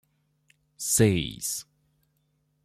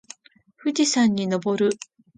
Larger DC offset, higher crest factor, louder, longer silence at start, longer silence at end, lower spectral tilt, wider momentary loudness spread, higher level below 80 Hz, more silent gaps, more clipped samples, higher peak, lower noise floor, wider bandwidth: neither; first, 20 dB vs 14 dB; second, -26 LUFS vs -22 LUFS; first, 0.8 s vs 0.65 s; first, 1.05 s vs 0.4 s; about the same, -4 dB/octave vs -4 dB/octave; first, 13 LU vs 10 LU; first, -54 dBFS vs -66 dBFS; neither; neither; about the same, -8 dBFS vs -8 dBFS; first, -72 dBFS vs -56 dBFS; first, 16 kHz vs 9.4 kHz